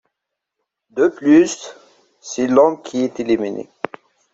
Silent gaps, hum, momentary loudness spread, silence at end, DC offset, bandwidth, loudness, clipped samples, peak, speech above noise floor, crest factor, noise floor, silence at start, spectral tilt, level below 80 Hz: none; none; 17 LU; 0.7 s; under 0.1%; 8 kHz; -17 LUFS; under 0.1%; -2 dBFS; 64 dB; 16 dB; -80 dBFS; 0.95 s; -5 dB/octave; -62 dBFS